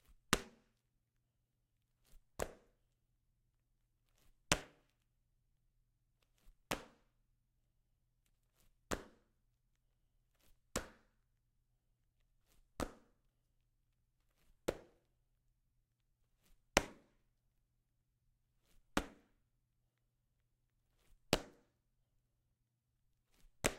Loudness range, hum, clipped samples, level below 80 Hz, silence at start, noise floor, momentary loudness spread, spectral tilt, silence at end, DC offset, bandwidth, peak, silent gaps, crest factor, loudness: 10 LU; none; under 0.1%; -62 dBFS; 0.3 s; -84 dBFS; 22 LU; -3 dB/octave; 0 s; under 0.1%; 16 kHz; -6 dBFS; none; 44 dB; -42 LUFS